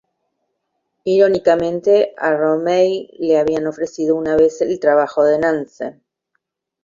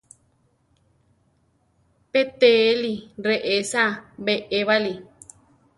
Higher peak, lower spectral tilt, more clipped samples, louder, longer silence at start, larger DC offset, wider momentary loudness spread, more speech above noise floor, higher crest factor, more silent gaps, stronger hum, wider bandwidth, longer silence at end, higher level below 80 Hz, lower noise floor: about the same, -2 dBFS vs -4 dBFS; first, -6 dB/octave vs -3.5 dB/octave; neither; first, -16 LUFS vs -21 LUFS; second, 1.05 s vs 2.15 s; neither; second, 9 LU vs 12 LU; first, 57 dB vs 44 dB; about the same, 16 dB vs 20 dB; neither; neither; second, 7.4 kHz vs 11.5 kHz; first, 0.9 s vs 0.75 s; first, -54 dBFS vs -64 dBFS; first, -73 dBFS vs -65 dBFS